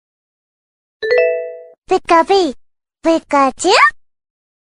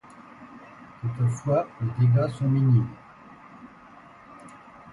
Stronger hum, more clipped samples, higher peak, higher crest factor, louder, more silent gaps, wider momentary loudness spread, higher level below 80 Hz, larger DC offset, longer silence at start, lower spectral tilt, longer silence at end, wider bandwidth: neither; neither; first, 0 dBFS vs -12 dBFS; about the same, 16 dB vs 16 dB; first, -14 LUFS vs -24 LUFS; first, 1.78-1.82 s vs none; second, 11 LU vs 25 LU; first, -52 dBFS vs -58 dBFS; neither; first, 1 s vs 0.2 s; second, -2 dB/octave vs -9 dB/octave; first, 0.7 s vs 0 s; about the same, 11 kHz vs 10.5 kHz